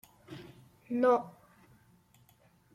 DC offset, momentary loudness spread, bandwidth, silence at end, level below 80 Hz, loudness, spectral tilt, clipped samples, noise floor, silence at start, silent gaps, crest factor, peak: under 0.1%; 23 LU; 14.5 kHz; 1.45 s; -76 dBFS; -30 LUFS; -7 dB/octave; under 0.1%; -65 dBFS; 0.3 s; none; 20 dB; -16 dBFS